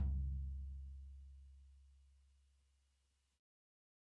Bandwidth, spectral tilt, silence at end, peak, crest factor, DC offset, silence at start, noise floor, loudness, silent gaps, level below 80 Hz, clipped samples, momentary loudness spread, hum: 1.1 kHz; -9.5 dB/octave; 1.95 s; -32 dBFS; 16 dB; under 0.1%; 0 s; -82 dBFS; -48 LUFS; none; -50 dBFS; under 0.1%; 23 LU; none